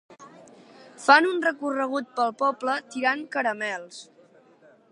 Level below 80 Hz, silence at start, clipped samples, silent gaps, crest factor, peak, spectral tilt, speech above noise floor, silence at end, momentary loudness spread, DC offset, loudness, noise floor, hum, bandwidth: -84 dBFS; 0.1 s; under 0.1%; none; 22 dB; -4 dBFS; -2.5 dB/octave; 32 dB; 0.9 s; 13 LU; under 0.1%; -24 LUFS; -56 dBFS; none; 11 kHz